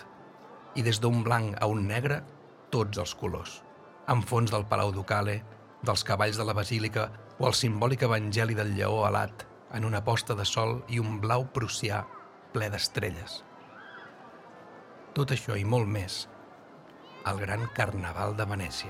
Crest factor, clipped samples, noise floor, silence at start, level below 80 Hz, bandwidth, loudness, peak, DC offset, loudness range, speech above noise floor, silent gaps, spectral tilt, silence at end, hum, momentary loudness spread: 22 dB; under 0.1%; -51 dBFS; 0 s; -58 dBFS; 15.5 kHz; -30 LUFS; -10 dBFS; under 0.1%; 5 LU; 22 dB; none; -5 dB/octave; 0 s; none; 20 LU